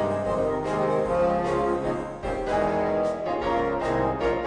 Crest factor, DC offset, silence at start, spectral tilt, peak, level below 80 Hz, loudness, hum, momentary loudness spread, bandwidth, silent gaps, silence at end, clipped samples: 14 dB; under 0.1%; 0 s; -7 dB/octave; -12 dBFS; -42 dBFS; -25 LUFS; none; 4 LU; 10 kHz; none; 0 s; under 0.1%